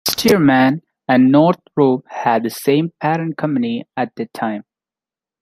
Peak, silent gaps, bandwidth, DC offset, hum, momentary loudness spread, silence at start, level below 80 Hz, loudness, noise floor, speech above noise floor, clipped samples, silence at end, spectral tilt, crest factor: 0 dBFS; none; 16 kHz; under 0.1%; none; 12 LU; 0.05 s; -58 dBFS; -16 LUFS; -90 dBFS; 74 dB; under 0.1%; 0.8 s; -5.5 dB/octave; 16 dB